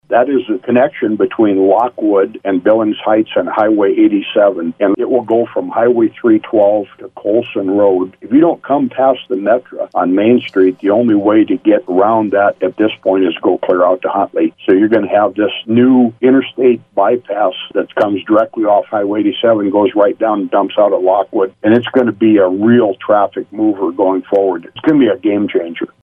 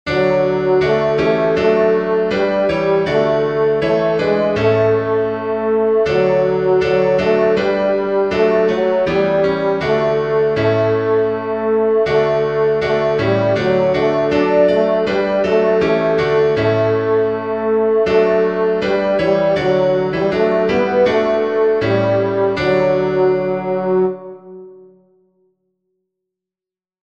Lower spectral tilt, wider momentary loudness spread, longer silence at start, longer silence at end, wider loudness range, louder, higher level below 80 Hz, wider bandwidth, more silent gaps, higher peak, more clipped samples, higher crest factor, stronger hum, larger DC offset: first, -9 dB/octave vs -7.5 dB/octave; about the same, 5 LU vs 3 LU; about the same, 0.1 s vs 0.05 s; second, 0.15 s vs 2.25 s; about the same, 2 LU vs 2 LU; about the same, -13 LUFS vs -15 LUFS; second, -60 dBFS vs -46 dBFS; second, 3.7 kHz vs 7.2 kHz; neither; about the same, 0 dBFS vs -2 dBFS; neither; about the same, 12 dB vs 14 dB; neither; second, under 0.1% vs 0.3%